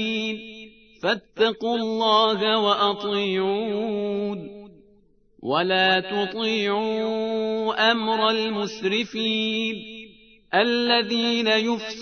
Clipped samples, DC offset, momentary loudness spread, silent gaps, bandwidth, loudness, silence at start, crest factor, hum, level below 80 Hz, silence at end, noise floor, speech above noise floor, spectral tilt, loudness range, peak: under 0.1%; under 0.1%; 10 LU; none; 6.6 kHz; -22 LUFS; 0 s; 18 dB; none; -64 dBFS; 0 s; -59 dBFS; 36 dB; -4.5 dB/octave; 3 LU; -6 dBFS